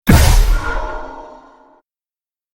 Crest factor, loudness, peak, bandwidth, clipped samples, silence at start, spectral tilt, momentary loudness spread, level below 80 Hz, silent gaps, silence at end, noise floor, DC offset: 16 dB; -16 LUFS; 0 dBFS; 17 kHz; under 0.1%; 0.05 s; -5 dB/octave; 24 LU; -18 dBFS; none; 1.3 s; under -90 dBFS; under 0.1%